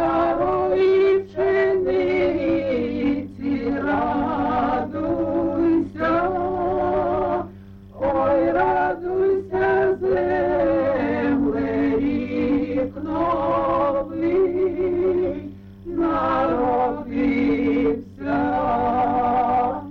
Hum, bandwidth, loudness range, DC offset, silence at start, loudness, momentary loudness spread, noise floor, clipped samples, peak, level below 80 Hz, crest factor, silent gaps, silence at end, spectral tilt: none; 6 kHz; 2 LU; under 0.1%; 0 s; -21 LUFS; 5 LU; -41 dBFS; under 0.1%; -10 dBFS; -44 dBFS; 10 dB; none; 0 s; -8.5 dB/octave